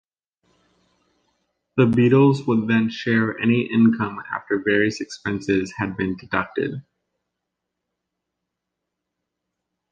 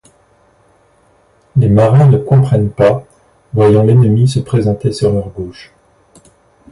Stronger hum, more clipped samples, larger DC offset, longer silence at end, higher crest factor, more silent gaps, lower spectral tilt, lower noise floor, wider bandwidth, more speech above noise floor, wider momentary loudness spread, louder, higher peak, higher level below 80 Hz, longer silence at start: neither; neither; neither; first, 3.1 s vs 1.1 s; first, 18 dB vs 12 dB; neither; second, -7 dB/octave vs -8.5 dB/octave; first, -82 dBFS vs -51 dBFS; second, 7.8 kHz vs 11.5 kHz; first, 62 dB vs 41 dB; about the same, 11 LU vs 13 LU; second, -21 LUFS vs -11 LUFS; second, -4 dBFS vs 0 dBFS; second, -56 dBFS vs -38 dBFS; first, 1.75 s vs 1.55 s